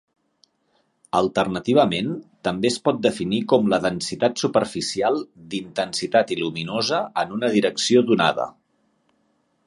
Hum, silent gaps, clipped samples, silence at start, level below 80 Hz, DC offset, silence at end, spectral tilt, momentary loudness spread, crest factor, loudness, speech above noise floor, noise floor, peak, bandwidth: none; none; under 0.1%; 1.15 s; -60 dBFS; under 0.1%; 1.15 s; -4.5 dB/octave; 9 LU; 20 dB; -22 LUFS; 46 dB; -67 dBFS; -4 dBFS; 11.5 kHz